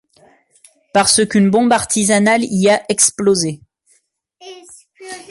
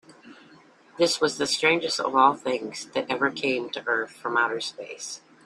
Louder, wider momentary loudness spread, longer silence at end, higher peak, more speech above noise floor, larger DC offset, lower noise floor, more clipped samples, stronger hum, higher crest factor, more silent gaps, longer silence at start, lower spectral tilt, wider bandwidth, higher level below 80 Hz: first, -13 LUFS vs -25 LUFS; first, 19 LU vs 12 LU; second, 0.1 s vs 0.3 s; first, 0 dBFS vs -4 dBFS; first, 46 dB vs 29 dB; neither; first, -60 dBFS vs -54 dBFS; neither; neither; second, 16 dB vs 22 dB; neither; first, 0.95 s vs 0.25 s; about the same, -3.5 dB/octave vs -2.5 dB/octave; second, 12 kHz vs 13.5 kHz; first, -54 dBFS vs -70 dBFS